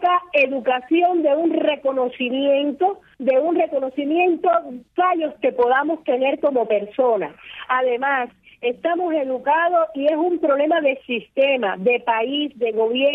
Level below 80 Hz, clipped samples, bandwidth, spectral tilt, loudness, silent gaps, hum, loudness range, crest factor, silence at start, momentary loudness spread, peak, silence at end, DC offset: -68 dBFS; under 0.1%; 4.5 kHz; -7 dB/octave; -20 LUFS; none; none; 2 LU; 14 dB; 0 s; 6 LU; -6 dBFS; 0 s; under 0.1%